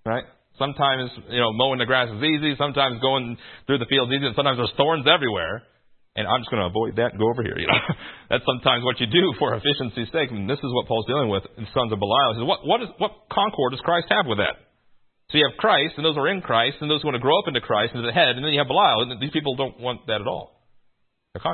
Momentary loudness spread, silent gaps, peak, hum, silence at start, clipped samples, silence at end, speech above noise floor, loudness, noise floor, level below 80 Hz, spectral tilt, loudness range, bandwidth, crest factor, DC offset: 9 LU; none; -2 dBFS; none; 0.05 s; under 0.1%; 0 s; 42 dB; -22 LUFS; -65 dBFS; -56 dBFS; -10 dB/octave; 3 LU; 4.4 kHz; 22 dB; under 0.1%